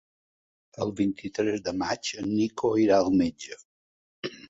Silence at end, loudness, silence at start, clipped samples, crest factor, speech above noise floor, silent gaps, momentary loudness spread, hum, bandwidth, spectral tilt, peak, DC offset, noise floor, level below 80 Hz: 0.1 s; -26 LUFS; 0.8 s; under 0.1%; 18 dB; over 64 dB; 3.65-4.23 s; 17 LU; none; 8 kHz; -5.5 dB/octave; -10 dBFS; under 0.1%; under -90 dBFS; -58 dBFS